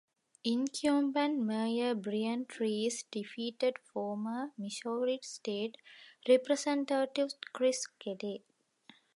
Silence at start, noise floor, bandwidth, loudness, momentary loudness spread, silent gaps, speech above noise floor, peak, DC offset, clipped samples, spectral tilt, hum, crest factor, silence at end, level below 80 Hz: 0.45 s; -63 dBFS; 11.5 kHz; -34 LUFS; 10 LU; none; 30 dB; -14 dBFS; under 0.1%; under 0.1%; -4 dB/octave; none; 20 dB; 0.8 s; -84 dBFS